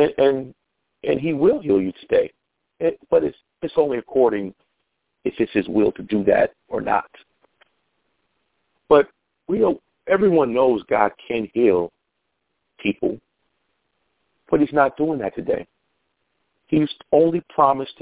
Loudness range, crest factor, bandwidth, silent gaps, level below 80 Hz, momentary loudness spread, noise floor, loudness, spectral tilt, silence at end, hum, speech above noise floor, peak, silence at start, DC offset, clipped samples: 5 LU; 20 dB; 4 kHz; none; -56 dBFS; 11 LU; -75 dBFS; -21 LUFS; -10.5 dB/octave; 0.1 s; none; 56 dB; -2 dBFS; 0 s; under 0.1%; under 0.1%